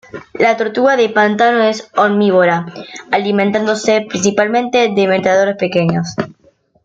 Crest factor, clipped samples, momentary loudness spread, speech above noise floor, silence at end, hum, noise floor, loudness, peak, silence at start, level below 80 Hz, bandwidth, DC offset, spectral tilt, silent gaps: 12 dB; under 0.1%; 8 LU; 40 dB; 0.55 s; none; -53 dBFS; -13 LUFS; -2 dBFS; 0.15 s; -56 dBFS; 7.8 kHz; under 0.1%; -5 dB/octave; none